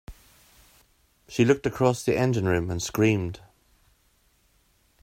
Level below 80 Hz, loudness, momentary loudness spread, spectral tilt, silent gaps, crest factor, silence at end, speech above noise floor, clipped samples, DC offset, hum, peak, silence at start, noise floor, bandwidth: -54 dBFS; -25 LUFS; 10 LU; -6 dB/octave; none; 20 dB; 1.65 s; 42 dB; under 0.1%; under 0.1%; none; -8 dBFS; 0.1 s; -65 dBFS; 16 kHz